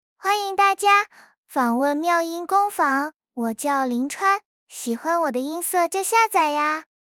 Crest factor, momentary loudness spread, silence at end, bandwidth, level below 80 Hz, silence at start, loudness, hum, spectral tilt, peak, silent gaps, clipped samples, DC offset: 16 dB; 11 LU; 0.3 s; 19.5 kHz; -78 dBFS; 0.25 s; -21 LUFS; none; -2 dB/octave; -6 dBFS; 1.37-1.44 s, 3.16-3.20 s, 4.45-4.67 s; under 0.1%; under 0.1%